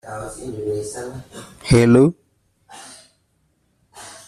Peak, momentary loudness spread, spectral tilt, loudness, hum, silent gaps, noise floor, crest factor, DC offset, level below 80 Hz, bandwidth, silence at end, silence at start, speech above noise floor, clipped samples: -2 dBFS; 27 LU; -6.5 dB/octave; -18 LUFS; none; none; -65 dBFS; 20 dB; under 0.1%; -42 dBFS; 13.5 kHz; 0.1 s; 0.05 s; 48 dB; under 0.1%